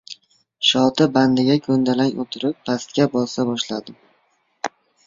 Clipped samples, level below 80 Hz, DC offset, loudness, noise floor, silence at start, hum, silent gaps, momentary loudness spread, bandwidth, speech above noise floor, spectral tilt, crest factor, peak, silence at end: under 0.1%; -60 dBFS; under 0.1%; -19 LUFS; -64 dBFS; 0.1 s; none; none; 15 LU; 7.6 kHz; 46 dB; -5 dB/octave; 18 dB; -2 dBFS; 0.4 s